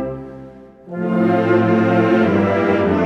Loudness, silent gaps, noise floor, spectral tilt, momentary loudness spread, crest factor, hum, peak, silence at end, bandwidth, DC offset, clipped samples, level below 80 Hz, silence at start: -16 LUFS; none; -39 dBFS; -8.5 dB/octave; 16 LU; 12 dB; none; -4 dBFS; 0 s; 7 kHz; under 0.1%; under 0.1%; -50 dBFS; 0 s